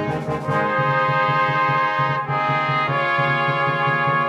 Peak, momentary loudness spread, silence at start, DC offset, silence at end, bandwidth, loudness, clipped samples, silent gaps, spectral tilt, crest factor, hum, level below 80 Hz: -6 dBFS; 3 LU; 0 s; under 0.1%; 0 s; 8.2 kHz; -19 LUFS; under 0.1%; none; -6.5 dB/octave; 12 dB; none; -56 dBFS